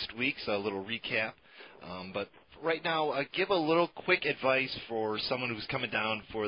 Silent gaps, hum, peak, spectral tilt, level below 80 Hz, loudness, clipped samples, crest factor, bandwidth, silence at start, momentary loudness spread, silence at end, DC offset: none; none; -12 dBFS; -8.5 dB/octave; -66 dBFS; -32 LUFS; under 0.1%; 20 dB; 5.4 kHz; 0 s; 11 LU; 0 s; under 0.1%